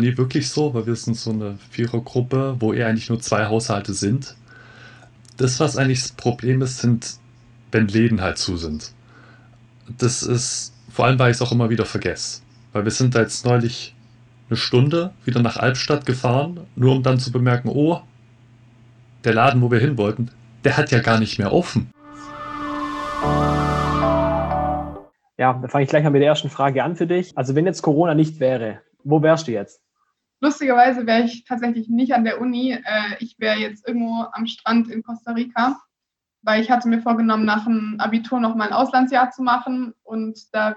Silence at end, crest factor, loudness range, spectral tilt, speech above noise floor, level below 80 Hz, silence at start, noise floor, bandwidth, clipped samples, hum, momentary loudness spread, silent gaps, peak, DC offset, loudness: 0 s; 16 dB; 4 LU; -5.5 dB/octave; 65 dB; -44 dBFS; 0 s; -84 dBFS; 10.5 kHz; under 0.1%; none; 11 LU; none; -4 dBFS; under 0.1%; -20 LUFS